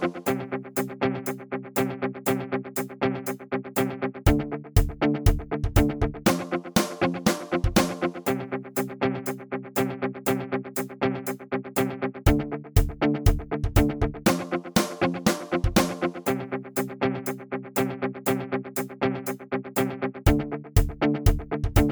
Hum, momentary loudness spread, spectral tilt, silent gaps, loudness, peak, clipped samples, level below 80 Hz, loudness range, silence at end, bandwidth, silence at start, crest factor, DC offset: none; 7 LU; -5.5 dB/octave; none; -27 LUFS; -6 dBFS; under 0.1%; -32 dBFS; 4 LU; 0 s; over 20 kHz; 0 s; 20 dB; under 0.1%